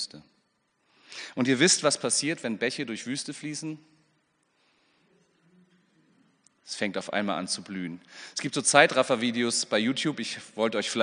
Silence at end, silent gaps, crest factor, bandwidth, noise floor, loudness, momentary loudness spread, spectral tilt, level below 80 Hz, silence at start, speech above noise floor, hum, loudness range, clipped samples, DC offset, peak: 0 s; none; 28 dB; 10 kHz; -72 dBFS; -26 LUFS; 17 LU; -2.5 dB/octave; -80 dBFS; 0 s; 45 dB; none; 15 LU; under 0.1%; under 0.1%; -2 dBFS